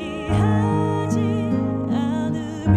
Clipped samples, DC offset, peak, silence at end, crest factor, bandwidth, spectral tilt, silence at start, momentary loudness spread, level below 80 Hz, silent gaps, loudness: under 0.1%; under 0.1%; -6 dBFS; 0 s; 14 dB; 9.8 kHz; -8 dB/octave; 0 s; 5 LU; -40 dBFS; none; -22 LUFS